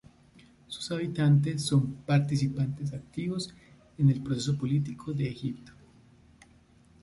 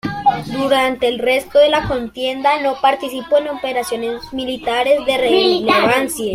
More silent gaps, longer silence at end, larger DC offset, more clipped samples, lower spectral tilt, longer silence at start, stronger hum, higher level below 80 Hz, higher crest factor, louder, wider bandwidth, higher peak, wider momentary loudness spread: neither; first, 1.3 s vs 0 s; neither; neither; first, -6.5 dB/octave vs -4 dB/octave; first, 0.7 s vs 0.05 s; neither; second, -60 dBFS vs -46 dBFS; about the same, 18 dB vs 14 dB; second, -29 LUFS vs -16 LUFS; second, 11.5 kHz vs 16 kHz; second, -12 dBFS vs -2 dBFS; first, 12 LU vs 9 LU